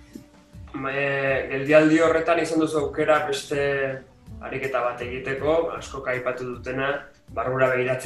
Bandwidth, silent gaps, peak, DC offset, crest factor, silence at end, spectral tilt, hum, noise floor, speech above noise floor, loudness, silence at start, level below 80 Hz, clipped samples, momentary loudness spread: 12.5 kHz; none; -4 dBFS; under 0.1%; 20 dB; 0 s; -5.5 dB/octave; none; -46 dBFS; 23 dB; -23 LUFS; 0 s; -50 dBFS; under 0.1%; 13 LU